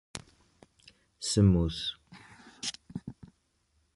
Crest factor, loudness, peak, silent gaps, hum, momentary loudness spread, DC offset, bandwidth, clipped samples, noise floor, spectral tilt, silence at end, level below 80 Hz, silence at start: 22 dB; -29 LUFS; -10 dBFS; none; none; 24 LU; under 0.1%; 11.5 kHz; under 0.1%; -73 dBFS; -5.5 dB/octave; 0.85 s; -46 dBFS; 0.15 s